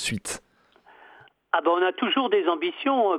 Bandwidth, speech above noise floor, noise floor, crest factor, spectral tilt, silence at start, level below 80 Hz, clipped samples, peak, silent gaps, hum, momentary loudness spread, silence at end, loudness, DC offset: 14.5 kHz; 34 dB; -57 dBFS; 18 dB; -3.5 dB/octave; 0 s; -62 dBFS; under 0.1%; -6 dBFS; none; none; 10 LU; 0 s; -24 LUFS; under 0.1%